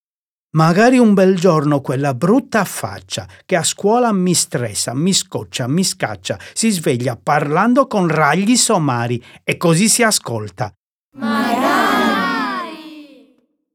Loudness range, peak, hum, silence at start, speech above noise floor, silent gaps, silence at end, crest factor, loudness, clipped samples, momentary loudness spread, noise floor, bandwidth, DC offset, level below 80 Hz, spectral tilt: 3 LU; 0 dBFS; none; 0.55 s; over 75 dB; 10.77-11.12 s; 0.7 s; 16 dB; -16 LUFS; under 0.1%; 13 LU; under -90 dBFS; 18 kHz; under 0.1%; -60 dBFS; -4.5 dB/octave